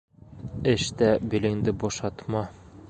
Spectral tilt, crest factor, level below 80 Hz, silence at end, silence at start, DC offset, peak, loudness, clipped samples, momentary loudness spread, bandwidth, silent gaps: -5.5 dB/octave; 20 dB; -48 dBFS; 0 s; 0.3 s; under 0.1%; -8 dBFS; -26 LUFS; under 0.1%; 14 LU; 9.2 kHz; none